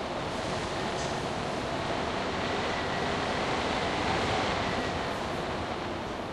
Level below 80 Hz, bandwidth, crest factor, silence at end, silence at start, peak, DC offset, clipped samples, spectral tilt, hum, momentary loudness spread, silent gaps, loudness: -48 dBFS; 12.5 kHz; 14 dB; 0 s; 0 s; -16 dBFS; under 0.1%; under 0.1%; -4.5 dB/octave; none; 5 LU; none; -31 LUFS